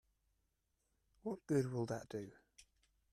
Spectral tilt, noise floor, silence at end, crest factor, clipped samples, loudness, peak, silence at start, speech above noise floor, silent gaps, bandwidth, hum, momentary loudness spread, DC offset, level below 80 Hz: -7 dB/octave; -84 dBFS; 0.5 s; 20 dB; under 0.1%; -42 LUFS; -24 dBFS; 1.25 s; 43 dB; none; 14 kHz; none; 12 LU; under 0.1%; -76 dBFS